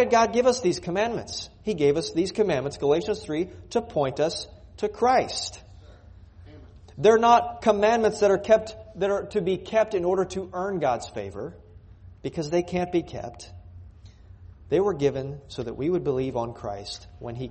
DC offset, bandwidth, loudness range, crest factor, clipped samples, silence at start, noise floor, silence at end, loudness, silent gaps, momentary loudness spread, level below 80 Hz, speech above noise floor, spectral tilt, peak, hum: under 0.1%; 8.8 kHz; 8 LU; 20 dB; under 0.1%; 0 s; -48 dBFS; 0 s; -25 LUFS; none; 16 LU; -52 dBFS; 24 dB; -5 dB/octave; -4 dBFS; none